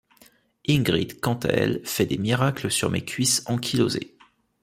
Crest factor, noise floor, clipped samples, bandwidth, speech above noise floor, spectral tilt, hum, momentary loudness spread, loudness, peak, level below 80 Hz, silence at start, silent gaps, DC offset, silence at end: 20 dB; -57 dBFS; under 0.1%; 16 kHz; 34 dB; -4.5 dB/octave; none; 5 LU; -24 LUFS; -4 dBFS; -54 dBFS; 0.7 s; none; under 0.1%; 0.55 s